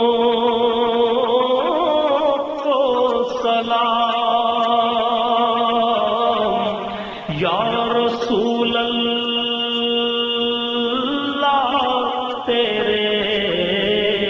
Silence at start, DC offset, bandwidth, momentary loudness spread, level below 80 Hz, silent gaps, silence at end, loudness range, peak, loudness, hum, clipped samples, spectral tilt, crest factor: 0 s; under 0.1%; 7.2 kHz; 3 LU; -52 dBFS; none; 0 s; 2 LU; -6 dBFS; -18 LUFS; none; under 0.1%; -5.5 dB/octave; 12 dB